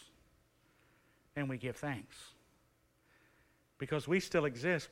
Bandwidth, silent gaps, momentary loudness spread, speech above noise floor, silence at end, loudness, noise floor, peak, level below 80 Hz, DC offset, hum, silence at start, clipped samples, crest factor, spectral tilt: 16 kHz; none; 19 LU; 36 dB; 0.05 s; -37 LUFS; -73 dBFS; -20 dBFS; -70 dBFS; under 0.1%; none; 0 s; under 0.1%; 20 dB; -5.5 dB/octave